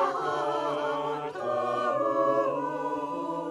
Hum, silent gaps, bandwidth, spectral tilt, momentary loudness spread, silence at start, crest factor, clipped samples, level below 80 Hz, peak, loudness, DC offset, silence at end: none; none; 11.5 kHz; -5.5 dB/octave; 7 LU; 0 s; 14 dB; under 0.1%; -74 dBFS; -14 dBFS; -29 LUFS; under 0.1%; 0 s